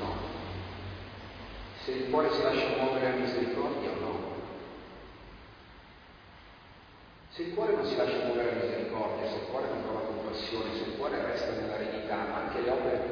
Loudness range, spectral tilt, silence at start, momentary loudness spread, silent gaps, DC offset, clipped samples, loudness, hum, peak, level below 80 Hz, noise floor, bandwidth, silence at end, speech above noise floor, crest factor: 10 LU; -3.5 dB/octave; 0 s; 23 LU; none; under 0.1%; under 0.1%; -32 LUFS; none; -14 dBFS; -56 dBFS; -54 dBFS; 5.4 kHz; 0 s; 22 dB; 20 dB